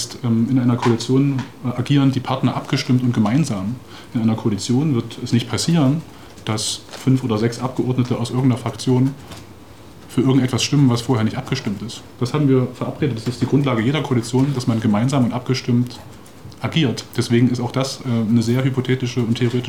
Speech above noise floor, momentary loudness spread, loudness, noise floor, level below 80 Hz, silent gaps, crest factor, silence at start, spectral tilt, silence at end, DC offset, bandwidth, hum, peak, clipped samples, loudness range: 23 dB; 9 LU; -19 LUFS; -41 dBFS; -54 dBFS; none; 14 dB; 0 s; -6 dB/octave; 0 s; 0.5%; 15.5 kHz; none; -4 dBFS; under 0.1%; 2 LU